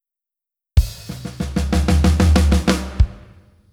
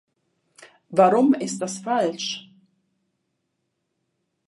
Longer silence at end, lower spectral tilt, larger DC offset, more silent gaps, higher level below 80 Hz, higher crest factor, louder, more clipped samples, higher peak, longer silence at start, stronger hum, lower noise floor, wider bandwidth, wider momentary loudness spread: second, 0.55 s vs 2.1 s; first, -6 dB/octave vs -4.5 dB/octave; neither; neither; first, -20 dBFS vs -78 dBFS; about the same, 18 dB vs 22 dB; first, -18 LUFS vs -22 LUFS; neither; first, 0 dBFS vs -4 dBFS; first, 0.75 s vs 0.6 s; neither; first, -87 dBFS vs -76 dBFS; first, 15 kHz vs 11.5 kHz; about the same, 13 LU vs 13 LU